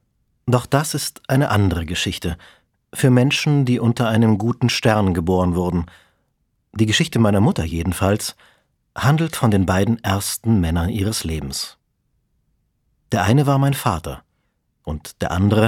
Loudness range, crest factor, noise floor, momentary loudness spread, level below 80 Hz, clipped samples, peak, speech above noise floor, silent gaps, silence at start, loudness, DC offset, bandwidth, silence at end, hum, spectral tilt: 4 LU; 18 dB; -69 dBFS; 13 LU; -38 dBFS; under 0.1%; -2 dBFS; 51 dB; none; 0.45 s; -19 LUFS; under 0.1%; 17.5 kHz; 0 s; none; -5.5 dB/octave